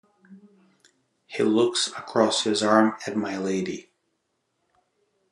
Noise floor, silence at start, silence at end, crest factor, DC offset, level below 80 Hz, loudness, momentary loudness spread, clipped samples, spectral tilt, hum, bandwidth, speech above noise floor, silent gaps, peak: -75 dBFS; 0.3 s; 1.5 s; 24 dB; under 0.1%; -76 dBFS; -23 LUFS; 10 LU; under 0.1%; -3.5 dB/octave; none; 11.5 kHz; 52 dB; none; -4 dBFS